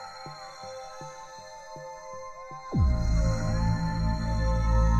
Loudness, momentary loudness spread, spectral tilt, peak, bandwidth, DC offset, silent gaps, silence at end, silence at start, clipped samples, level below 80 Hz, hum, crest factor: -28 LUFS; 16 LU; -7 dB/octave; -12 dBFS; 8.2 kHz; under 0.1%; none; 0 s; 0 s; under 0.1%; -30 dBFS; none; 14 dB